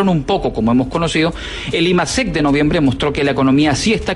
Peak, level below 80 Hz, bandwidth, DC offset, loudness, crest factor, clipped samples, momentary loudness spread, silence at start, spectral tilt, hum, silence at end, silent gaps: -4 dBFS; -32 dBFS; 11.5 kHz; under 0.1%; -15 LUFS; 12 dB; under 0.1%; 4 LU; 0 s; -5 dB/octave; none; 0 s; none